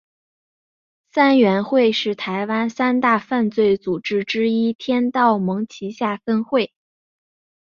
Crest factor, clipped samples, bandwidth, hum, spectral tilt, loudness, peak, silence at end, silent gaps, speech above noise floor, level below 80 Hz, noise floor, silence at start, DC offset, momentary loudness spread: 18 dB; under 0.1%; 7.2 kHz; none; -6.5 dB/octave; -19 LUFS; -2 dBFS; 1 s; 4.75-4.79 s; over 72 dB; -64 dBFS; under -90 dBFS; 1.15 s; under 0.1%; 8 LU